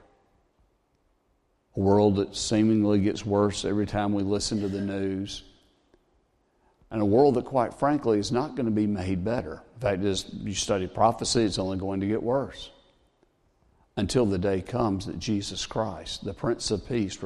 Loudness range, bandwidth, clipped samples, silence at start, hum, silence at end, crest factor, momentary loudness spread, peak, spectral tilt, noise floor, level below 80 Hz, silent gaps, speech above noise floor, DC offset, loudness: 5 LU; 12 kHz; under 0.1%; 1.75 s; none; 0 s; 20 dB; 10 LU; -8 dBFS; -5.5 dB/octave; -70 dBFS; -52 dBFS; none; 44 dB; under 0.1%; -26 LUFS